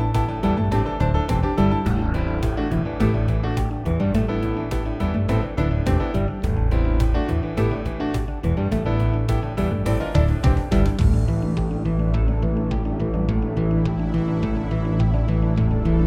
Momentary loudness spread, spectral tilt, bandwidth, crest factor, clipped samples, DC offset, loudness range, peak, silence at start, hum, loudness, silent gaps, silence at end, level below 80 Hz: 4 LU; -8.5 dB/octave; 10.5 kHz; 14 dB; under 0.1%; under 0.1%; 2 LU; -6 dBFS; 0 s; none; -22 LUFS; none; 0 s; -24 dBFS